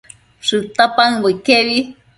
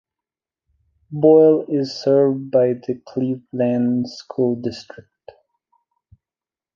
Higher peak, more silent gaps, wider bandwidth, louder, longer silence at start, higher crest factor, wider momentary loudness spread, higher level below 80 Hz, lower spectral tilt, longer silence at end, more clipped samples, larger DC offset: about the same, 0 dBFS vs -2 dBFS; neither; first, 11.5 kHz vs 7.2 kHz; first, -14 LUFS vs -18 LUFS; second, 0.45 s vs 1.1 s; about the same, 16 dB vs 18 dB; second, 7 LU vs 14 LU; first, -56 dBFS vs -64 dBFS; second, -3.5 dB/octave vs -8 dB/octave; second, 0.25 s vs 1.95 s; neither; neither